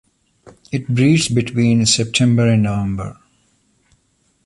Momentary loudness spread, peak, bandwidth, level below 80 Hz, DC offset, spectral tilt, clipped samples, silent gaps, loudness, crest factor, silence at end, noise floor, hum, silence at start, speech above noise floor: 12 LU; -2 dBFS; 11.5 kHz; -44 dBFS; under 0.1%; -5 dB/octave; under 0.1%; none; -16 LUFS; 16 dB; 1.35 s; -62 dBFS; none; 0.45 s; 47 dB